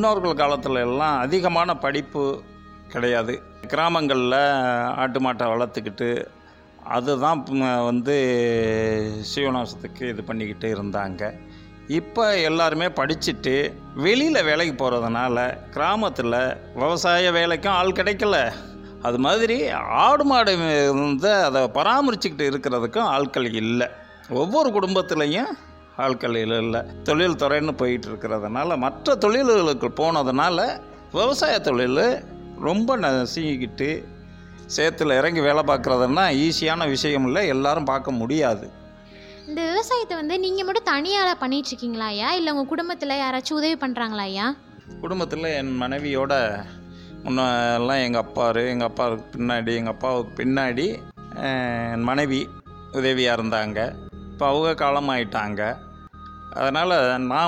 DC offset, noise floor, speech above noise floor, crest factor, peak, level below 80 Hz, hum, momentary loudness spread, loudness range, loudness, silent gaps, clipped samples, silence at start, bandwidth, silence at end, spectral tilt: under 0.1%; -44 dBFS; 22 dB; 16 dB; -6 dBFS; -50 dBFS; none; 10 LU; 5 LU; -22 LUFS; none; under 0.1%; 0 s; 15.5 kHz; 0 s; -5 dB/octave